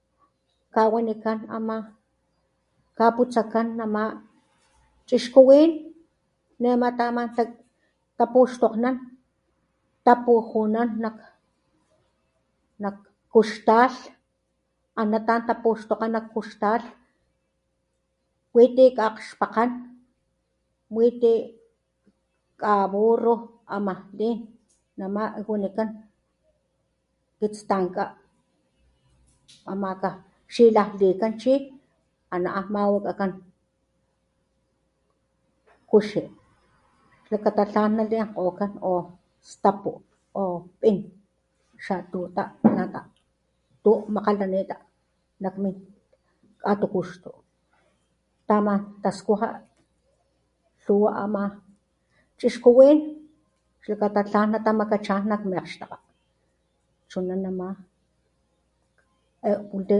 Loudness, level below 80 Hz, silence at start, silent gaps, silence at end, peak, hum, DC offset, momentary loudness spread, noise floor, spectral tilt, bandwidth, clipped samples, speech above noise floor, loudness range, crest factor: -23 LUFS; -68 dBFS; 0.75 s; none; 0 s; 0 dBFS; none; under 0.1%; 15 LU; -74 dBFS; -7 dB/octave; 11 kHz; under 0.1%; 52 dB; 10 LU; 24 dB